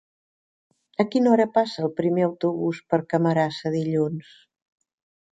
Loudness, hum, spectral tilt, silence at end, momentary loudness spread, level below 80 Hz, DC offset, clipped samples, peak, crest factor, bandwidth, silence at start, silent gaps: -23 LUFS; none; -7.5 dB/octave; 1.15 s; 8 LU; -68 dBFS; under 0.1%; under 0.1%; -6 dBFS; 18 dB; 9.2 kHz; 1 s; none